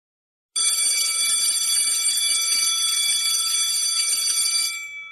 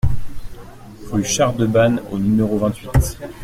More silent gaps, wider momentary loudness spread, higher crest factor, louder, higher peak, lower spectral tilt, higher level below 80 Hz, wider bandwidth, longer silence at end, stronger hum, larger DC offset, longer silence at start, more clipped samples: neither; second, 3 LU vs 17 LU; about the same, 14 dB vs 16 dB; about the same, -18 LUFS vs -18 LUFS; second, -8 dBFS vs -2 dBFS; second, 5 dB/octave vs -5.5 dB/octave; second, -70 dBFS vs -30 dBFS; second, 13.5 kHz vs 16 kHz; about the same, 0 s vs 0 s; neither; neither; first, 0.55 s vs 0.05 s; neither